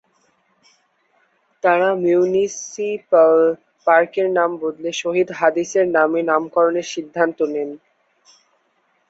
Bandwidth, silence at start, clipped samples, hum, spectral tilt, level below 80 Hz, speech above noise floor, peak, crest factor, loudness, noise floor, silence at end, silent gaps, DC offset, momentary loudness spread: 8 kHz; 1.65 s; under 0.1%; none; -4.5 dB/octave; -68 dBFS; 47 dB; -2 dBFS; 18 dB; -18 LUFS; -64 dBFS; 1.35 s; none; under 0.1%; 10 LU